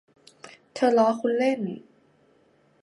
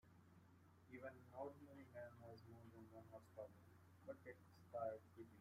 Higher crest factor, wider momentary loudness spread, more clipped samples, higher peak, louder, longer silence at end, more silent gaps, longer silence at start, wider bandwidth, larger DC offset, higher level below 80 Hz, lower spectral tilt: about the same, 18 dB vs 22 dB; first, 18 LU vs 12 LU; neither; first, -8 dBFS vs -38 dBFS; first, -24 LUFS vs -58 LUFS; first, 1 s vs 0 s; neither; first, 0.45 s vs 0.05 s; second, 11.5 kHz vs 15.5 kHz; neither; first, -78 dBFS vs -88 dBFS; second, -6 dB/octave vs -7.5 dB/octave